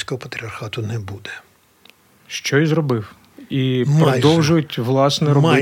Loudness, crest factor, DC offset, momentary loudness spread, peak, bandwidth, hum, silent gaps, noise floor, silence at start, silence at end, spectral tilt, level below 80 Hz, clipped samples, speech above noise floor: -18 LUFS; 18 dB; under 0.1%; 16 LU; -2 dBFS; 16 kHz; none; none; -52 dBFS; 0 s; 0 s; -6 dB/octave; -56 dBFS; under 0.1%; 34 dB